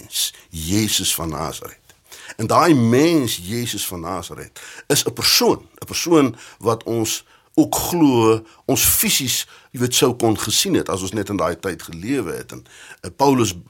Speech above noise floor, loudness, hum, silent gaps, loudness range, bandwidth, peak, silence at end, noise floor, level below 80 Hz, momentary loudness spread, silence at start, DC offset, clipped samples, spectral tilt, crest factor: 21 dB; -18 LUFS; none; none; 3 LU; 17 kHz; -2 dBFS; 0.1 s; -40 dBFS; -46 dBFS; 17 LU; 0.05 s; under 0.1%; under 0.1%; -3.5 dB/octave; 18 dB